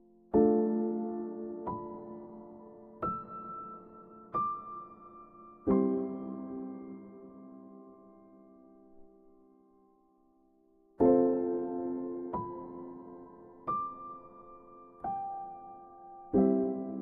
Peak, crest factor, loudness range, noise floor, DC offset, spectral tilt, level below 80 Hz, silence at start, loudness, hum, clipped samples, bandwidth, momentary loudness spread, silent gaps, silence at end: -12 dBFS; 22 dB; 10 LU; -67 dBFS; under 0.1%; -11.5 dB/octave; -64 dBFS; 0.35 s; -33 LUFS; none; under 0.1%; 2.8 kHz; 25 LU; none; 0 s